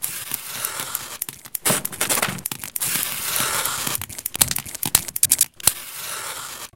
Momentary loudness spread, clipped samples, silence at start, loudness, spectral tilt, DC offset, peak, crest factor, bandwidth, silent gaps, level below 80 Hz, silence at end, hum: 11 LU; under 0.1%; 0 s; -22 LUFS; -0.5 dB/octave; 0.2%; 0 dBFS; 24 dB; 17.5 kHz; none; -54 dBFS; 0.05 s; none